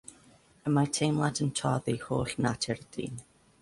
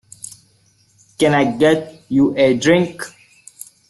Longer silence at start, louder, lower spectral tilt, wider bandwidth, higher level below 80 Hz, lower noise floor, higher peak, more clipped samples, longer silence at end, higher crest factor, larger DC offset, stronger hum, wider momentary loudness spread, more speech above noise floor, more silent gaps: second, 0.1 s vs 1.2 s; second, -31 LUFS vs -16 LUFS; about the same, -5 dB/octave vs -5.5 dB/octave; about the same, 11.5 kHz vs 12.5 kHz; about the same, -58 dBFS vs -54 dBFS; first, -60 dBFS vs -56 dBFS; second, -14 dBFS vs -2 dBFS; neither; second, 0.4 s vs 0.8 s; about the same, 18 dB vs 16 dB; neither; neither; second, 11 LU vs 21 LU; second, 30 dB vs 42 dB; neither